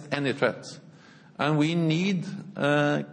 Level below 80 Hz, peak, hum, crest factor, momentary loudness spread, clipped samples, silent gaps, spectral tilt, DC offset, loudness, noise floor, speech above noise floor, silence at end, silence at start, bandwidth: -74 dBFS; -8 dBFS; none; 18 dB; 18 LU; under 0.1%; none; -6.5 dB/octave; under 0.1%; -26 LUFS; -51 dBFS; 26 dB; 0 s; 0 s; 9.8 kHz